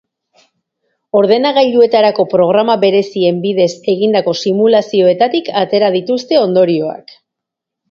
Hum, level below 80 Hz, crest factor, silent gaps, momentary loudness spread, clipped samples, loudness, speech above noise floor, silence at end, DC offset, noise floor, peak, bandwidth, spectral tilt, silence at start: none; -62 dBFS; 12 dB; none; 5 LU; under 0.1%; -12 LUFS; 69 dB; 0.9 s; under 0.1%; -80 dBFS; 0 dBFS; 7.6 kHz; -6 dB/octave; 1.15 s